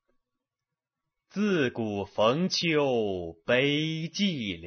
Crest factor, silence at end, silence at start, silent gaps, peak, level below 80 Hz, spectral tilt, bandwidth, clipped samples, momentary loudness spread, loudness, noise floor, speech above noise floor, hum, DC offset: 18 dB; 0 s; 1.35 s; none; -10 dBFS; -60 dBFS; -5 dB/octave; 6.6 kHz; under 0.1%; 8 LU; -27 LUFS; -89 dBFS; 62 dB; none; under 0.1%